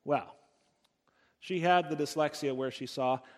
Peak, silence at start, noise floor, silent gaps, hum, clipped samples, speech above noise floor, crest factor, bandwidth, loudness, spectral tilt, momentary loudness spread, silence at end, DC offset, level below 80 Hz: -12 dBFS; 0.05 s; -74 dBFS; none; none; under 0.1%; 42 dB; 20 dB; 15.5 kHz; -32 LUFS; -5 dB/octave; 10 LU; 0.1 s; under 0.1%; -80 dBFS